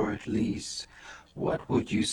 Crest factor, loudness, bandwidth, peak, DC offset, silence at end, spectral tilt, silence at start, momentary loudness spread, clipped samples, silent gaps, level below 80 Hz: 16 dB; -31 LUFS; 12 kHz; -14 dBFS; under 0.1%; 0 s; -5 dB/octave; 0 s; 16 LU; under 0.1%; none; -54 dBFS